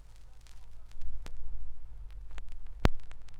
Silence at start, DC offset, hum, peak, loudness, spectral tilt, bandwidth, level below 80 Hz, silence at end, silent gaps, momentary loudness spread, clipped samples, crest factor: 0.1 s; under 0.1%; none; -2 dBFS; -41 LUFS; -6 dB/octave; 7.8 kHz; -38 dBFS; 0 s; none; 23 LU; under 0.1%; 28 dB